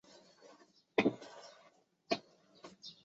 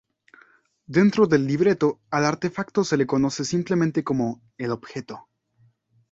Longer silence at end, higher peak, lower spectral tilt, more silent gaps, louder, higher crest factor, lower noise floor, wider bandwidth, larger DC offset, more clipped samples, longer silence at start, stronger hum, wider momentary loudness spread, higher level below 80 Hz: second, 0.15 s vs 0.9 s; second, -16 dBFS vs -4 dBFS; second, -3 dB/octave vs -6 dB/octave; neither; second, -37 LUFS vs -23 LUFS; first, 26 dB vs 18 dB; first, -68 dBFS vs -62 dBFS; about the same, 8 kHz vs 7.8 kHz; neither; neither; about the same, 1 s vs 0.9 s; neither; first, 27 LU vs 12 LU; second, -82 dBFS vs -60 dBFS